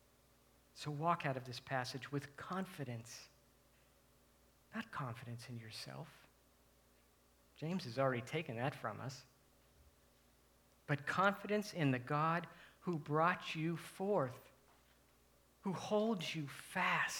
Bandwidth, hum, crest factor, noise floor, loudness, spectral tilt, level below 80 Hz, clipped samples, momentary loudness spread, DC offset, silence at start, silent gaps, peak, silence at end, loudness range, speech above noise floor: 19.5 kHz; 60 Hz at -70 dBFS; 24 dB; -71 dBFS; -41 LUFS; -5.5 dB/octave; -76 dBFS; under 0.1%; 15 LU; under 0.1%; 0.75 s; none; -18 dBFS; 0 s; 13 LU; 31 dB